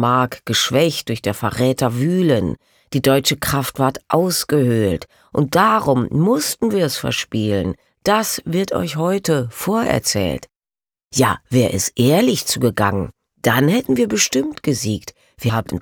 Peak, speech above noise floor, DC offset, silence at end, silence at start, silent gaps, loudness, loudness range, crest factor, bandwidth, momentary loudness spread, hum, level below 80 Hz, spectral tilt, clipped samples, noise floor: -2 dBFS; over 72 dB; under 0.1%; 0 s; 0 s; none; -18 LUFS; 3 LU; 16 dB; over 20 kHz; 8 LU; none; -46 dBFS; -4.5 dB/octave; under 0.1%; under -90 dBFS